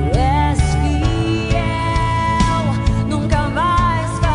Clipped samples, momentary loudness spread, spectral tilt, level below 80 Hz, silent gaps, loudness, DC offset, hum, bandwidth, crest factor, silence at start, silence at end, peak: under 0.1%; 3 LU; -6 dB/octave; -22 dBFS; none; -17 LUFS; under 0.1%; none; 10.5 kHz; 12 dB; 0 s; 0 s; -4 dBFS